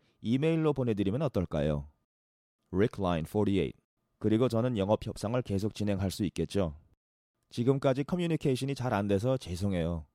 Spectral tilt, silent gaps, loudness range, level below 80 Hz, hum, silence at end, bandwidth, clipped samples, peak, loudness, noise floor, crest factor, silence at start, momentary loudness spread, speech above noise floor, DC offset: -7.5 dB/octave; 2.04-2.59 s, 3.84-3.97 s, 6.97-7.34 s; 2 LU; -52 dBFS; none; 0.1 s; 15.5 kHz; under 0.1%; -12 dBFS; -31 LUFS; under -90 dBFS; 18 dB; 0.2 s; 5 LU; over 60 dB; under 0.1%